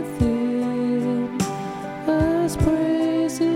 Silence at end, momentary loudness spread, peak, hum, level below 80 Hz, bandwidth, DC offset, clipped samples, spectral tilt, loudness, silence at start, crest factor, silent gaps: 0 s; 6 LU; -8 dBFS; none; -36 dBFS; 16 kHz; under 0.1%; under 0.1%; -6.5 dB/octave; -22 LUFS; 0 s; 14 dB; none